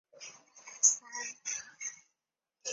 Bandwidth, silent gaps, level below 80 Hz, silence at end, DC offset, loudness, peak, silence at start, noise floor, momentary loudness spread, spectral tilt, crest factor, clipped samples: 8.4 kHz; none; -88 dBFS; 0 s; under 0.1%; -31 LUFS; -10 dBFS; 0.15 s; -88 dBFS; 23 LU; 3 dB/octave; 26 dB; under 0.1%